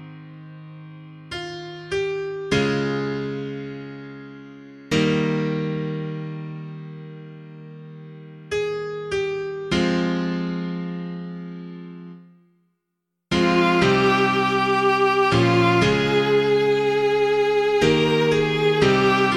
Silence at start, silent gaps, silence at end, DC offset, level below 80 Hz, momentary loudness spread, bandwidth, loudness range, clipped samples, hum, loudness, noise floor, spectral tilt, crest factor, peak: 0 s; none; 0 s; under 0.1%; -50 dBFS; 23 LU; 12 kHz; 12 LU; under 0.1%; none; -21 LUFS; -79 dBFS; -6 dB/octave; 18 dB; -4 dBFS